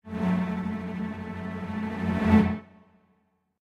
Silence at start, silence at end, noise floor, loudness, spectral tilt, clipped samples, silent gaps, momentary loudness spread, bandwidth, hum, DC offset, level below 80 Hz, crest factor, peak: 0.05 s; 1 s; -70 dBFS; -28 LUFS; -8.5 dB/octave; under 0.1%; none; 13 LU; 7.4 kHz; none; under 0.1%; -48 dBFS; 22 dB; -6 dBFS